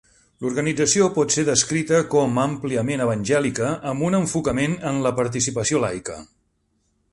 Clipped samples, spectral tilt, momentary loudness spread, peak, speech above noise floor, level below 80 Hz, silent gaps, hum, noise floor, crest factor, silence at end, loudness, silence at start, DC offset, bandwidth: under 0.1%; -4.5 dB/octave; 7 LU; -4 dBFS; 47 dB; -52 dBFS; none; none; -68 dBFS; 18 dB; 0.85 s; -21 LUFS; 0.4 s; under 0.1%; 11.5 kHz